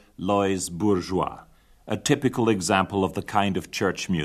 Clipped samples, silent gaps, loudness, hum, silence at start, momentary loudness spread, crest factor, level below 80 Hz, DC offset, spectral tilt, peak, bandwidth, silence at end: under 0.1%; none; -24 LUFS; none; 0.2 s; 6 LU; 20 dB; -54 dBFS; under 0.1%; -5 dB/octave; -6 dBFS; 14 kHz; 0 s